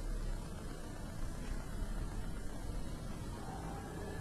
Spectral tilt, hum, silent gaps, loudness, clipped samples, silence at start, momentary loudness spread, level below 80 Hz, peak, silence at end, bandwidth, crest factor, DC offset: -5.5 dB/octave; none; none; -46 LUFS; under 0.1%; 0 s; 3 LU; -44 dBFS; -28 dBFS; 0 s; 13.5 kHz; 14 dB; under 0.1%